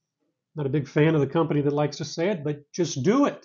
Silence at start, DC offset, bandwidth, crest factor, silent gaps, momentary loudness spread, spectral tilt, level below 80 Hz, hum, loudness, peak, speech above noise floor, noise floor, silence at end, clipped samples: 0.55 s; under 0.1%; 7.4 kHz; 16 dB; none; 9 LU; -6.5 dB/octave; -66 dBFS; none; -25 LUFS; -10 dBFS; 54 dB; -78 dBFS; 0.05 s; under 0.1%